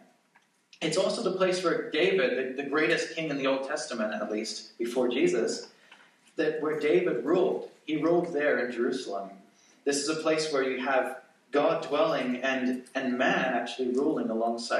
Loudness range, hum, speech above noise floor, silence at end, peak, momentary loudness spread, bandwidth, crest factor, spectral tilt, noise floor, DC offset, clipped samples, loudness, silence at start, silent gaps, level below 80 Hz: 2 LU; none; 38 dB; 0 s; -12 dBFS; 8 LU; 12.5 kHz; 16 dB; -4 dB/octave; -66 dBFS; under 0.1%; under 0.1%; -28 LUFS; 0.8 s; none; -86 dBFS